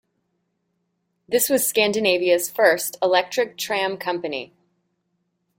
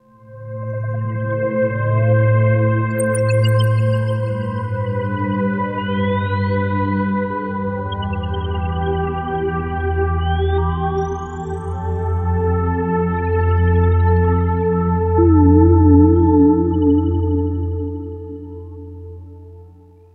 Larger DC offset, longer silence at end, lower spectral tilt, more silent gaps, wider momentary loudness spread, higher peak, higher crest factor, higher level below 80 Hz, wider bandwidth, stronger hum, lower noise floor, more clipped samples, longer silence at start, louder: neither; first, 1.15 s vs 0.45 s; second, -2 dB/octave vs -8.5 dB/octave; neither; second, 8 LU vs 14 LU; about the same, -4 dBFS vs -2 dBFS; about the same, 18 dB vs 16 dB; second, -68 dBFS vs -30 dBFS; first, 17 kHz vs 10 kHz; neither; first, -73 dBFS vs -44 dBFS; neither; first, 1.3 s vs 0.3 s; about the same, -20 LUFS vs -18 LUFS